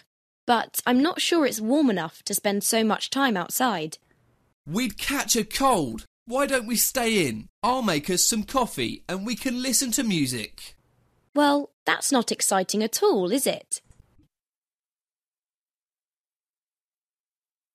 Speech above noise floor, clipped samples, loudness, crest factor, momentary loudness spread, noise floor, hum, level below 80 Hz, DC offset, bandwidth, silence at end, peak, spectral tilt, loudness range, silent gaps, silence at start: over 66 dB; under 0.1%; -24 LUFS; 20 dB; 9 LU; under -90 dBFS; none; -54 dBFS; under 0.1%; 14 kHz; 3.95 s; -6 dBFS; -3 dB/octave; 3 LU; 4.53-4.64 s, 6.07-6.26 s, 7.49-7.62 s, 11.29-11.33 s, 11.73-11.86 s; 0.45 s